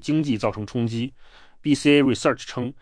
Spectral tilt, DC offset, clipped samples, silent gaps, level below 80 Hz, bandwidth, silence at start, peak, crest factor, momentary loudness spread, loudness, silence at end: -5.5 dB/octave; under 0.1%; under 0.1%; none; -52 dBFS; 10.5 kHz; 0 s; -6 dBFS; 18 dB; 13 LU; -22 LUFS; 0.05 s